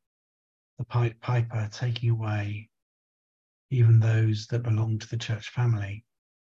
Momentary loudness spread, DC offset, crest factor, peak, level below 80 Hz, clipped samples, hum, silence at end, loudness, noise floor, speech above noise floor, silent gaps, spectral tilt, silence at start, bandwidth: 12 LU; under 0.1%; 14 dB; -12 dBFS; -56 dBFS; under 0.1%; none; 0.55 s; -27 LUFS; under -90 dBFS; over 65 dB; 2.82-3.69 s; -7 dB/octave; 0.8 s; 7.2 kHz